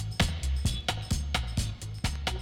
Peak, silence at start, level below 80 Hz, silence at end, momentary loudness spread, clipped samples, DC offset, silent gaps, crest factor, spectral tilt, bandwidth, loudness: -10 dBFS; 0 s; -34 dBFS; 0 s; 5 LU; under 0.1%; under 0.1%; none; 20 dB; -4 dB/octave; 16.5 kHz; -31 LUFS